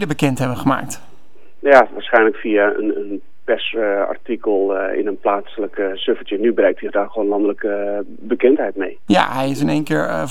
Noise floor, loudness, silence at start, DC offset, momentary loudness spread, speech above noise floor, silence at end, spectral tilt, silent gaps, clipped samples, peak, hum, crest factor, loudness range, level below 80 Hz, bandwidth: -52 dBFS; -18 LUFS; 0 s; 3%; 9 LU; 35 dB; 0 s; -6 dB/octave; none; under 0.1%; 0 dBFS; none; 18 dB; 3 LU; -54 dBFS; 16 kHz